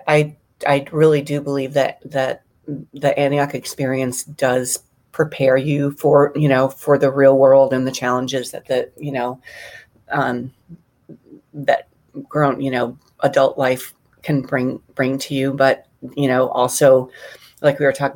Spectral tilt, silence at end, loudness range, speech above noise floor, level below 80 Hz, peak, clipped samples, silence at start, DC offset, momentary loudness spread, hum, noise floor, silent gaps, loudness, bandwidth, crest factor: -5.5 dB/octave; 0 s; 9 LU; 28 dB; -60 dBFS; -2 dBFS; under 0.1%; 0.05 s; under 0.1%; 18 LU; none; -45 dBFS; none; -18 LUFS; 18 kHz; 16 dB